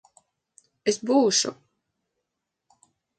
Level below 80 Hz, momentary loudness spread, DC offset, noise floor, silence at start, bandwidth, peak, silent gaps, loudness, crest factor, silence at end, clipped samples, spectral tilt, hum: -78 dBFS; 10 LU; under 0.1%; -83 dBFS; 0.85 s; 9.4 kHz; -8 dBFS; none; -23 LUFS; 20 dB; 1.65 s; under 0.1%; -2.5 dB/octave; none